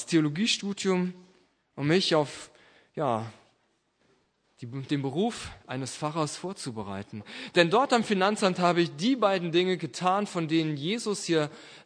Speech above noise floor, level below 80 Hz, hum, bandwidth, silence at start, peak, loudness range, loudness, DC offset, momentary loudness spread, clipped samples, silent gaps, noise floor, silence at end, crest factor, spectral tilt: 44 dB; -66 dBFS; none; 10.5 kHz; 0 s; -6 dBFS; 9 LU; -27 LUFS; under 0.1%; 15 LU; under 0.1%; none; -71 dBFS; 0.05 s; 22 dB; -5 dB/octave